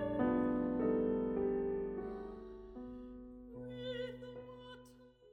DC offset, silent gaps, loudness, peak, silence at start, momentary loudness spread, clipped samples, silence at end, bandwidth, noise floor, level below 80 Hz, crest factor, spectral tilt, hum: under 0.1%; none; -38 LUFS; -24 dBFS; 0 s; 18 LU; under 0.1%; 0 s; 5.8 kHz; -61 dBFS; -60 dBFS; 16 dB; -8.5 dB/octave; none